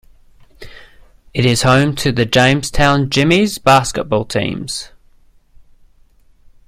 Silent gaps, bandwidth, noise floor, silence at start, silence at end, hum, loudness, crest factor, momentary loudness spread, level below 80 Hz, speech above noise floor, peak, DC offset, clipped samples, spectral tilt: none; 16 kHz; -49 dBFS; 0.6 s; 1.8 s; none; -14 LUFS; 16 dB; 12 LU; -34 dBFS; 35 dB; 0 dBFS; under 0.1%; under 0.1%; -5 dB/octave